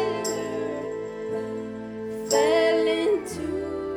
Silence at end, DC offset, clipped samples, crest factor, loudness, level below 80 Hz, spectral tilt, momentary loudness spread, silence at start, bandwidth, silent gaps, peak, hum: 0 s; under 0.1%; under 0.1%; 16 dB; -26 LUFS; -56 dBFS; -3.5 dB/octave; 13 LU; 0 s; 16.5 kHz; none; -8 dBFS; none